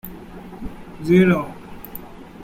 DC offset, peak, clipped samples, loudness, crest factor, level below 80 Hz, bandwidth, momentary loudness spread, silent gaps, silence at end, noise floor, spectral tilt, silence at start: under 0.1%; -4 dBFS; under 0.1%; -18 LUFS; 18 dB; -44 dBFS; 16.5 kHz; 23 LU; none; 0 s; -37 dBFS; -8 dB/octave; 0.05 s